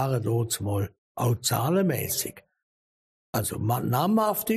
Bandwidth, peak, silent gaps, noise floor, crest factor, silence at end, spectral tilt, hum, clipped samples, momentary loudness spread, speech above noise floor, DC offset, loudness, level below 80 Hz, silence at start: 15.5 kHz; -10 dBFS; 0.98-1.15 s, 2.63-3.33 s; under -90 dBFS; 16 dB; 0 s; -5 dB/octave; none; under 0.1%; 7 LU; over 64 dB; under 0.1%; -26 LUFS; -58 dBFS; 0 s